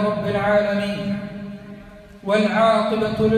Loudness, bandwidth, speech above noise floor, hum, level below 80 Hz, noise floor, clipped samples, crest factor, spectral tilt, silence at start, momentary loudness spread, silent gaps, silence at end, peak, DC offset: -20 LUFS; 13 kHz; 23 dB; none; -48 dBFS; -41 dBFS; under 0.1%; 16 dB; -6.5 dB/octave; 0 s; 19 LU; none; 0 s; -4 dBFS; under 0.1%